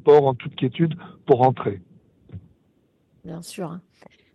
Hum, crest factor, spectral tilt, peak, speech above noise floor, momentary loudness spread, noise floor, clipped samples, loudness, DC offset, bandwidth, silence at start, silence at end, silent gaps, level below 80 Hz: none; 18 dB; -7.5 dB/octave; -4 dBFS; 43 dB; 27 LU; -64 dBFS; under 0.1%; -22 LUFS; under 0.1%; 12.5 kHz; 0.05 s; 0.55 s; none; -62 dBFS